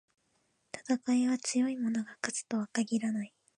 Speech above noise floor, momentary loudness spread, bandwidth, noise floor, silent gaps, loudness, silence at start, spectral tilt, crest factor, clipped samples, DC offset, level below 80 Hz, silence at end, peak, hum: 44 dB; 8 LU; 11 kHz; -75 dBFS; none; -32 LUFS; 0.75 s; -4 dB/octave; 20 dB; under 0.1%; under 0.1%; -84 dBFS; 0.3 s; -14 dBFS; none